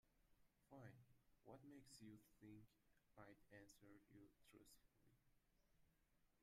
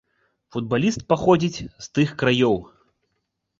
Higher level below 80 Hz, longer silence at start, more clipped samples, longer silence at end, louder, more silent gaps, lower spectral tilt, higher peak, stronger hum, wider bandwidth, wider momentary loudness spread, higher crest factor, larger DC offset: second, -84 dBFS vs -52 dBFS; second, 0.05 s vs 0.55 s; neither; second, 0 s vs 0.95 s; second, -67 LUFS vs -21 LUFS; neither; about the same, -5 dB/octave vs -6 dB/octave; second, -50 dBFS vs -4 dBFS; neither; first, 15 kHz vs 7.8 kHz; second, 4 LU vs 12 LU; about the same, 20 dB vs 20 dB; neither